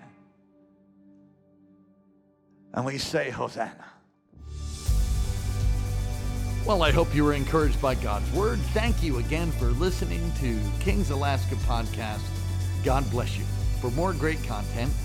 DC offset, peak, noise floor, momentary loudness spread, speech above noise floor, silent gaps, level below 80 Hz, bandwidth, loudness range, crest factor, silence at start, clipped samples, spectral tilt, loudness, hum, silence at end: under 0.1%; -8 dBFS; -62 dBFS; 8 LU; 36 dB; none; -30 dBFS; 16.5 kHz; 9 LU; 18 dB; 0 s; under 0.1%; -6 dB/octave; -27 LUFS; none; 0 s